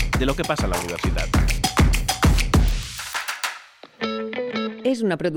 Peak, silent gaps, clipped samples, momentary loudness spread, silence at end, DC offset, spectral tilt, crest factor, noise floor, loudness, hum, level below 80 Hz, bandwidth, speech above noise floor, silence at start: -6 dBFS; none; under 0.1%; 9 LU; 0 s; under 0.1%; -4.5 dB/octave; 16 dB; -42 dBFS; -23 LUFS; none; -26 dBFS; over 20 kHz; 21 dB; 0 s